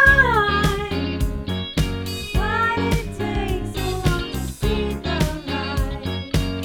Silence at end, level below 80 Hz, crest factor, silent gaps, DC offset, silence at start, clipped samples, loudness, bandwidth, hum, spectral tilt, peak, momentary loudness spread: 0 s; -28 dBFS; 20 dB; none; under 0.1%; 0 s; under 0.1%; -22 LUFS; 18 kHz; none; -5 dB/octave; -2 dBFS; 8 LU